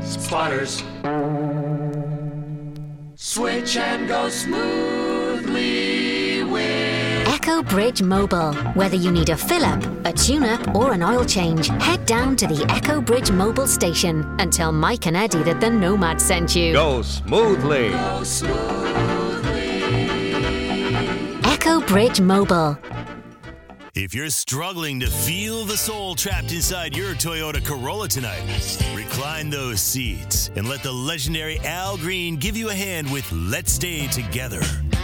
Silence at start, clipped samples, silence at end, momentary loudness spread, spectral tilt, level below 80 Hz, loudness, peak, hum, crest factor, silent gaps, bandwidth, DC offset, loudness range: 0 s; under 0.1%; 0 s; 8 LU; -4 dB/octave; -34 dBFS; -21 LUFS; 0 dBFS; none; 20 dB; none; 17.5 kHz; under 0.1%; 5 LU